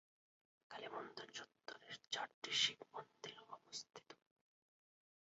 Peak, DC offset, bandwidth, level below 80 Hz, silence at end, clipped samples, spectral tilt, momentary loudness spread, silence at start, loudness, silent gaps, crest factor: -24 dBFS; under 0.1%; 7.6 kHz; under -90 dBFS; 1.15 s; under 0.1%; 1.5 dB/octave; 21 LU; 0.7 s; -45 LUFS; 2.34-2.42 s; 26 dB